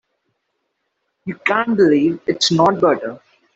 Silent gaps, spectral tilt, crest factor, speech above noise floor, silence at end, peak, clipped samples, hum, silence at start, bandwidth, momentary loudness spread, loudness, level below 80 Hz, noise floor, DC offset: none; -4.5 dB/octave; 16 dB; 56 dB; 0.4 s; -2 dBFS; under 0.1%; none; 1.25 s; 8.2 kHz; 16 LU; -16 LUFS; -60 dBFS; -72 dBFS; under 0.1%